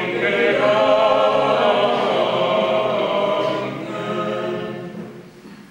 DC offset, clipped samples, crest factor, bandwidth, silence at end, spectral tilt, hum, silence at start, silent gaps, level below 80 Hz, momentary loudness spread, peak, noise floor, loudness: under 0.1%; under 0.1%; 14 dB; 10.5 kHz; 0.05 s; -5.5 dB/octave; none; 0 s; none; -60 dBFS; 12 LU; -4 dBFS; -41 dBFS; -18 LUFS